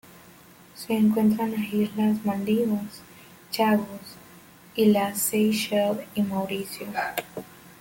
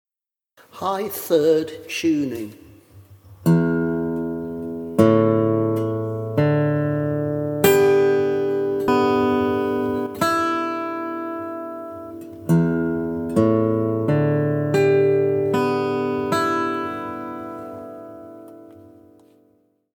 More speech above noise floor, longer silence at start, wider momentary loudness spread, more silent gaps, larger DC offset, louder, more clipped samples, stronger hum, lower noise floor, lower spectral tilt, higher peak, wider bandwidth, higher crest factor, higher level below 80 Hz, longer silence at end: second, 26 dB vs 68 dB; second, 0.15 s vs 0.75 s; first, 18 LU vs 15 LU; neither; neither; second, -25 LUFS vs -21 LUFS; neither; neither; second, -51 dBFS vs -90 dBFS; second, -5 dB/octave vs -7 dB/octave; second, -10 dBFS vs 0 dBFS; second, 17 kHz vs over 20 kHz; about the same, 16 dB vs 20 dB; second, -64 dBFS vs -56 dBFS; second, 0.1 s vs 1.1 s